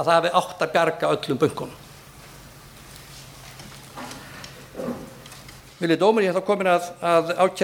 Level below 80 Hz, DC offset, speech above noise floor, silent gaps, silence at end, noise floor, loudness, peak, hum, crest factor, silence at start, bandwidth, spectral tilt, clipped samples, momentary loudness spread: -56 dBFS; under 0.1%; 24 dB; none; 0 s; -45 dBFS; -22 LUFS; -4 dBFS; none; 20 dB; 0 s; 19 kHz; -5 dB/octave; under 0.1%; 24 LU